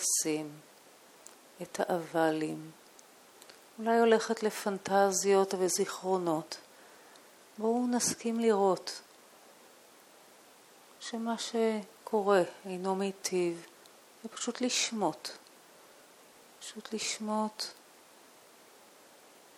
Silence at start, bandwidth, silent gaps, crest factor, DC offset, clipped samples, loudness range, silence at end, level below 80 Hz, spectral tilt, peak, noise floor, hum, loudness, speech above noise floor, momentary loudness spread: 0 s; 17 kHz; none; 22 dB; under 0.1%; under 0.1%; 9 LU; 1.85 s; -84 dBFS; -3.5 dB/octave; -12 dBFS; -58 dBFS; none; -31 LUFS; 27 dB; 20 LU